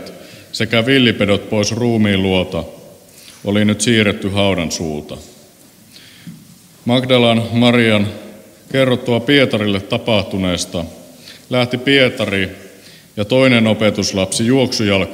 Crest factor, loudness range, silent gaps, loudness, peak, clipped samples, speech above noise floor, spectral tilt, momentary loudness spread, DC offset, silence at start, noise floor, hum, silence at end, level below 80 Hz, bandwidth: 16 dB; 4 LU; none; -15 LUFS; 0 dBFS; under 0.1%; 30 dB; -5 dB/octave; 14 LU; under 0.1%; 0 s; -45 dBFS; none; 0 s; -48 dBFS; 16.5 kHz